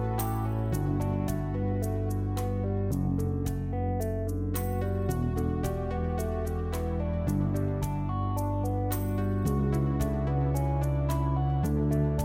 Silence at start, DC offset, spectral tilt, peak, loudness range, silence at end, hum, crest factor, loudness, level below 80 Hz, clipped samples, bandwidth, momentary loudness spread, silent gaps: 0 s; under 0.1%; -8 dB/octave; -16 dBFS; 2 LU; 0 s; none; 14 dB; -30 LUFS; -36 dBFS; under 0.1%; 16.5 kHz; 4 LU; none